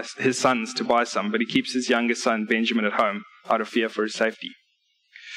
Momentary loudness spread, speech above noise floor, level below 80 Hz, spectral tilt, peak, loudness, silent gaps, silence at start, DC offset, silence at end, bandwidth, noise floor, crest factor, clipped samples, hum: 4 LU; 45 dB; -70 dBFS; -3.5 dB/octave; -8 dBFS; -23 LUFS; none; 0 s; under 0.1%; 0 s; 12 kHz; -69 dBFS; 16 dB; under 0.1%; none